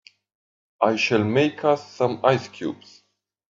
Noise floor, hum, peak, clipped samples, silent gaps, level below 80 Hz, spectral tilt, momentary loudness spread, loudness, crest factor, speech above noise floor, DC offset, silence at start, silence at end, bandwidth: -71 dBFS; none; -2 dBFS; under 0.1%; none; -66 dBFS; -6 dB/octave; 12 LU; -22 LUFS; 22 dB; 49 dB; under 0.1%; 0.8 s; 0.75 s; 7.6 kHz